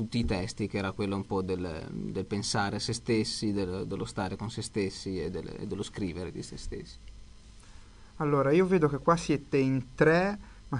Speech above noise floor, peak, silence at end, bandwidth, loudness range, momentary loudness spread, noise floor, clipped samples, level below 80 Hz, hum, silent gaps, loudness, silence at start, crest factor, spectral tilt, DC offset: 21 dB; -10 dBFS; 0 s; 11 kHz; 9 LU; 14 LU; -51 dBFS; under 0.1%; -48 dBFS; none; none; -30 LUFS; 0 s; 20 dB; -5.5 dB/octave; under 0.1%